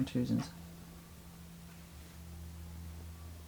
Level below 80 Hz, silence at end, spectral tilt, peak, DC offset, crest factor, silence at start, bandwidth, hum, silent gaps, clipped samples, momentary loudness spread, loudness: -54 dBFS; 0 s; -6.5 dB/octave; -22 dBFS; under 0.1%; 18 dB; 0 s; over 20 kHz; none; none; under 0.1%; 17 LU; -44 LUFS